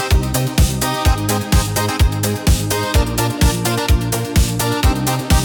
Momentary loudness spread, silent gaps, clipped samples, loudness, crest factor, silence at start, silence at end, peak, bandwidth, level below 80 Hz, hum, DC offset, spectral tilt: 2 LU; none; under 0.1%; -17 LUFS; 12 dB; 0 s; 0 s; -4 dBFS; 19 kHz; -20 dBFS; none; under 0.1%; -4.5 dB/octave